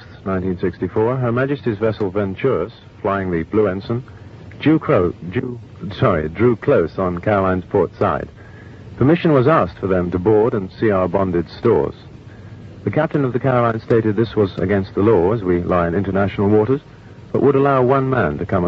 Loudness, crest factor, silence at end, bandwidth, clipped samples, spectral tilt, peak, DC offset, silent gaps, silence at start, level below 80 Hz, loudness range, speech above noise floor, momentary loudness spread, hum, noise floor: -18 LUFS; 16 dB; 0 s; 6.2 kHz; under 0.1%; -10 dB/octave; 0 dBFS; under 0.1%; none; 0 s; -44 dBFS; 3 LU; 20 dB; 11 LU; none; -37 dBFS